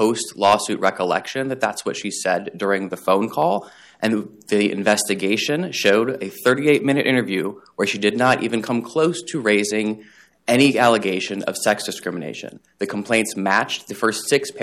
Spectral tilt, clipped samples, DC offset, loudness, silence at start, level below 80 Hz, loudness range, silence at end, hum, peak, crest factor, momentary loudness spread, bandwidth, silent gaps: -4 dB/octave; under 0.1%; under 0.1%; -20 LUFS; 0 s; -66 dBFS; 3 LU; 0 s; none; -4 dBFS; 16 dB; 9 LU; 15.5 kHz; none